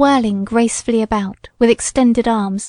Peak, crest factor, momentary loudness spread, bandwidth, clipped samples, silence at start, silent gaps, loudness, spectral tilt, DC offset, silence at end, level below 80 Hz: -2 dBFS; 14 dB; 5 LU; 11 kHz; under 0.1%; 0 s; none; -16 LUFS; -4.5 dB/octave; under 0.1%; 0 s; -40 dBFS